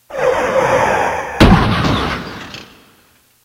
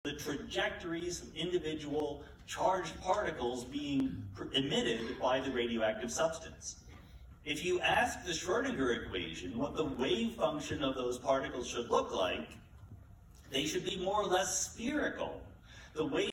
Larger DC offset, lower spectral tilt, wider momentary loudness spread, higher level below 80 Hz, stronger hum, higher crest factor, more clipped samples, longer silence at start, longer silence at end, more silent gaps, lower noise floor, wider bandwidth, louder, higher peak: neither; first, -6 dB/octave vs -3.5 dB/octave; first, 19 LU vs 13 LU; first, -26 dBFS vs -58 dBFS; neither; about the same, 16 dB vs 18 dB; first, 0.1% vs under 0.1%; about the same, 0.1 s vs 0.05 s; first, 0.8 s vs 0 s; neither; second, -52 dBFS vs -56 dBFS; about the same, 16.5 kHz vs 17.5 kHz; first, -14 LUFS vs -35 LUFS; first, 0 dBFS vs -18 dBFS